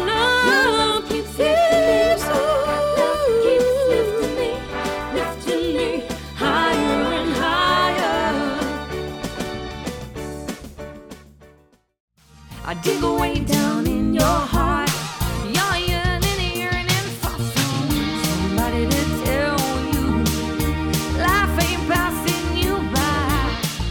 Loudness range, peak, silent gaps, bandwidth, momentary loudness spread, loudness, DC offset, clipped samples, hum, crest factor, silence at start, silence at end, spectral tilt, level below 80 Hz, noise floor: 9 LU; -4 dBFS; 12.00-12.08 s; 19 kHz; 11 LU; -20 LUFS; under 0.1%; under 0.1%; none; 16 dB; 0 s; 0 s; -4.5 dB/octave; -32 dBFS; -55 dBFS